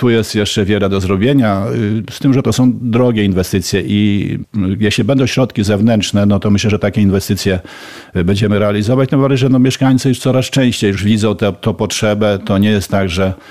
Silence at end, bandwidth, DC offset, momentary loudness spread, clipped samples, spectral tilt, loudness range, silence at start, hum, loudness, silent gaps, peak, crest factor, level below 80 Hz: 0 s; 15 kHz; 0.6%; 5 LU; under 0.1%; -6 dB/octave; 1 LU; 0 s; none; -13 LUFS; none; -2 dBFS; 10 dB; -40 dBFS